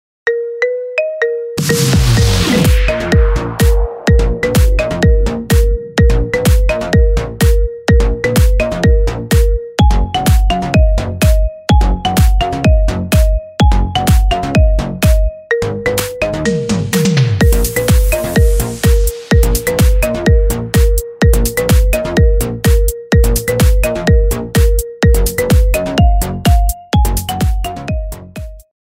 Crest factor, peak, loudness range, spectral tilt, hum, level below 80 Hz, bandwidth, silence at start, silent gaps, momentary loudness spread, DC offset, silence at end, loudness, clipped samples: 10 dB; 0 dBFS; 1 LU; -5.5 dB/octave; none; -14 dBFS; 16.5 kHz; 0.25 s; none; 4 LU; under 0.1%; 0.2 s; -13 LUFS; under 0.1%